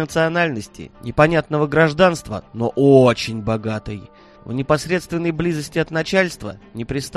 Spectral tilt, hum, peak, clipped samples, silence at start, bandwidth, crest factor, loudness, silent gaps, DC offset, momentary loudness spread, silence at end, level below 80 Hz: -6 dB/octave; none; 0 dBFS; under 0.1%; 0 s; 13 kHz; 18 dB; -18 LUFS; none; under 0.1%; 18 LU; 0 s; -44 dBFS